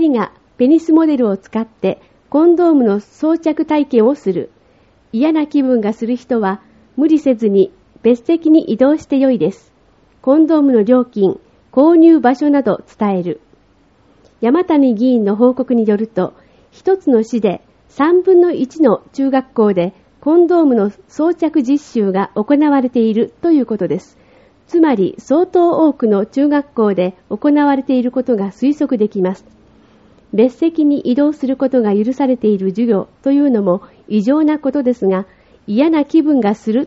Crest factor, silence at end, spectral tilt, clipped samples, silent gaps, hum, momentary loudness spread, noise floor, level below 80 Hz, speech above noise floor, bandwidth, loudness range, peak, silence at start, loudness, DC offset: 14 dB; 0 s; -7 dB/octave; under 0.1%; none; none; 9 LU; -52 dBFS; -56 dBFS; 39 dB; 7.6 kHz; 3 LU; 0 dBFS; 0 s; -14 LUFS; under 0.1%